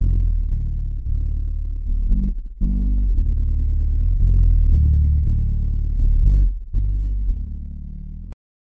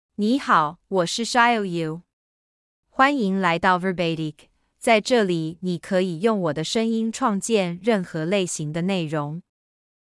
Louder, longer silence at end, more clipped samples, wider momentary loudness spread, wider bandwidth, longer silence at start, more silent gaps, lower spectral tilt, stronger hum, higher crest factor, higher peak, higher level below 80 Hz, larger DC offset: about the same, -22 LUFS vs -22 LUFS; second, 0.3 s vs 0.8 s; neither; first, 14 LU vs 10 LU; second, 1 kHz vs 12 kHz; second, 0 s vs 0.2 s; second, none vs 2.13-2.83 s; first, -11 dB/octave vs -5 dB/octave; neither; second, 12 dB vs 18 dB; about the same, -6 dBFS vs -4 dBFS; first, -18 dBFS vs -62 dBFS; first, 0.4% vs under 0.1%